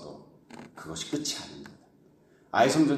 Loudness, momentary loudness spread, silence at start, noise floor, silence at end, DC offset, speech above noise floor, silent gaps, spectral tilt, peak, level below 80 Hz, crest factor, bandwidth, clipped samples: -29 LUFS; 26 LU; 0 s; -60 dBFS; 0 s; under 0.1%; 34 dB; none; -4 dB/octave; -10 dBFS; -66 dBFS; 20 dB; 14 kHz; under 0.1%